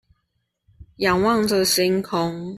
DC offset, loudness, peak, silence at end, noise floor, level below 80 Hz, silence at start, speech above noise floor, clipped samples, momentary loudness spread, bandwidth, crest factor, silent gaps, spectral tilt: under 0.1%; -20 LUFS; -6 dBFS; 0 s; -74 dBFS; -52 dBFS; 0.8 s; 54 dB; under 0.1%; 6 LU; 14.5 kHz; 16 dB; none; -4 dB/octave